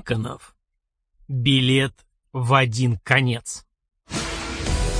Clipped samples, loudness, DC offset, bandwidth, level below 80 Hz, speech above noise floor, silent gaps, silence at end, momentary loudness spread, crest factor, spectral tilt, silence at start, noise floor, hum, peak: under 0.1%; -22 LUFS; under 0.1%; 10.5 kHz; -36 dBFS; 57 dB; none; 0 s; 15 LU; 20 dB; -5 dB/octave; 0.05 s; -78 dBFS; none; -2 dBFS